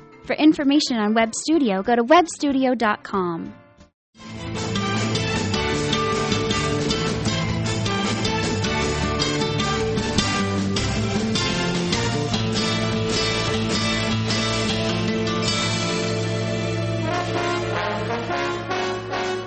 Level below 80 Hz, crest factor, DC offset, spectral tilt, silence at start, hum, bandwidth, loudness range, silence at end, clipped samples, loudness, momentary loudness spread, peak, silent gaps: -40 dBFS; 18 dB; under 0.1%; -4.5 dB/octave; 0 s; none; 8.8 kHz; 4 LU; 0 s; under 0.1%; -22 LUFS; 6 LU; -4 dBFS; 3.94-4.13 s